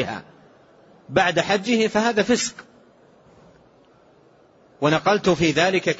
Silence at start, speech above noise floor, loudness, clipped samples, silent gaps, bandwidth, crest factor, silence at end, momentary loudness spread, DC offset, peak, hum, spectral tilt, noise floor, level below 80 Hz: 0 s; 34 dB; -20 LUFS; under 0.1%; none; 8 kHz; 18 dB; 0 s; 7 LU; under 0.1%; -6 dBFS; none; -4 dB/octave; -54 dBFS; -56 dBFS